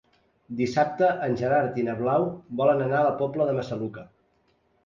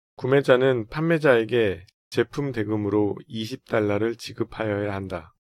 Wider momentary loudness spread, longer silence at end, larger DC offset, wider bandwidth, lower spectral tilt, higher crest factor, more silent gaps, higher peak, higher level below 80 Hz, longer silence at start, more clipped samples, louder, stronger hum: second, 10 LU vs 13 LU; first, 0.8 s vs 0.2 s; neither; second, 7.4 kHz vs 14 kHz; about the same, -7.5 dB/octave vs -7 dB/octave; about the same, 16 dB vs 20 dB; second, none vs 1.94-2.11 s; second, -10 dBFS vs -4 dBFS; second, -62 dBFS vs -56 dBFS; first, 0.5 s vs 0.2 s; neither; about the same, -25 LUFS vs -24 LUFS; neither